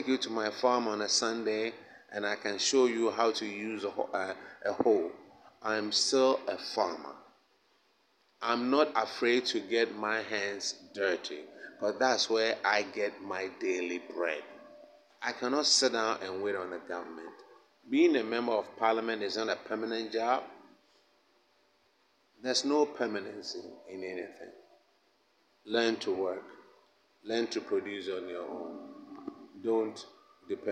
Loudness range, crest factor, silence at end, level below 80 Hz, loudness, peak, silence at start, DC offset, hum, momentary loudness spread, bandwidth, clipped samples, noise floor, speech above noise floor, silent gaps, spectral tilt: 6 LU; 22 dB; 0 s; -84 dBFS; -31 LUFS; -12 dBFS; 0 s; under 0.1%; none; 17 LU; 11 kHz; under 0.1%; -70 dBFS; 39 dB; none; -2 dB/octave